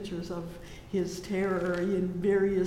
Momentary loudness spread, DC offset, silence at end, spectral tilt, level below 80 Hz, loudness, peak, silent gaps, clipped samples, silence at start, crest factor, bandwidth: 12 LU; under 0.1%; 0 s; -7 dB/octave; -52 dBFS; -31 LUFS; -16 dBFS; none; under 0.1%; 0 s; 14 dB; 15 kHz